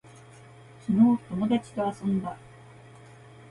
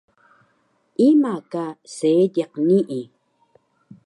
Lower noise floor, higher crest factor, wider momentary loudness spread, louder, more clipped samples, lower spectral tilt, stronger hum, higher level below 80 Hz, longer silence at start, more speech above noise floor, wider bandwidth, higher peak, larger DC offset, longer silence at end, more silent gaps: second, -50 dBFS vs -65 dBFS; about the same, 18 dB vs 16 dB; first, 18 LU vs 15 LU; second, -26 LUFS vs -20 LUFS; neither; about the same, -8 dB/octave vs -7.5 dB/octave; neither; first, -62 dBFS vs -76 dBFS; about the same, 0.9 s vs 1 s; second, 25 dB vs 46 dB; about the same, 11 kHz vs 11 kHz; second, -10 dBFS vs -6 dBFS; neither; about the same, 1.1 s vs 1 s; neither